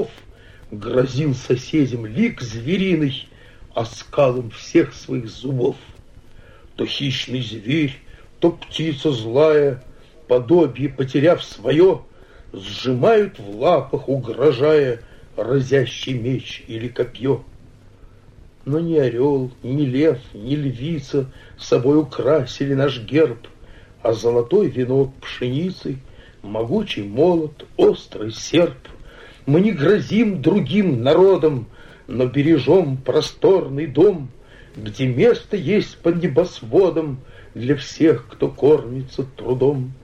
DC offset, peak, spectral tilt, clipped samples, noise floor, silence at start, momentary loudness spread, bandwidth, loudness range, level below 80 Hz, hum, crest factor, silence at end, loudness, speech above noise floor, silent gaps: under 0.1%; -2 dBFS; -7 dB/octave; under 0.1%; -45 dBFS; 0 s; 12 LU; 9.6 kHz; 6 LU; -46 dBFS; none; 16 dB; 0.1 s; -19 LUFS; 27 dB; none